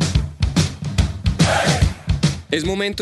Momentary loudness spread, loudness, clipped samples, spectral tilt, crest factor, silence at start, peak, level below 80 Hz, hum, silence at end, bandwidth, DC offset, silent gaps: 5 LU; -19 LUFS; under 0.1%; -5 dB/octave; 16 dB; 0 s; -4 dBFS; -26 dBFS; none; 0 s; 12.5 kHz; under 0.1%; none